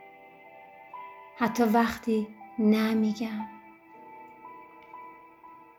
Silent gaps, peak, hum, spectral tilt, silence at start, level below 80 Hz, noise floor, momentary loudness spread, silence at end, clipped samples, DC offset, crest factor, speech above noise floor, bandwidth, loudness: none; -10 dBFS; none; -6 dB/octave; 0 s; -64 dBFS; -52 dBFS; 26 LU; 0.25 s; under 0.1%; under 0.1%; 20 dB; 26 dB; 16.5 kHz; -27 LUFS